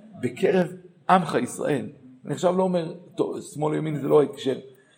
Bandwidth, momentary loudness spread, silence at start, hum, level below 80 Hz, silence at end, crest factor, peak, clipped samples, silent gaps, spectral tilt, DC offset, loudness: 16.5 kHz; 14 LU; 0.05 s; none; -72 dBFS; 0.3 s; 22 dB; -4 dBFS; under 0.1%; none; -6.5 dB/octave; under 0.1%; -25 LUFS